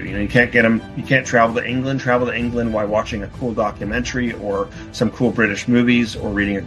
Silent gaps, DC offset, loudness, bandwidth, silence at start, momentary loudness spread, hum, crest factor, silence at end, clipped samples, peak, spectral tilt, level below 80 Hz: none; under 0.1%; -18 LUFS; 11.5 kHz; 0 s; 8 LU; none; 18 dB; 0 s; under 0.1%; -2 dBFS; -6 dB/octave; -38 dBFS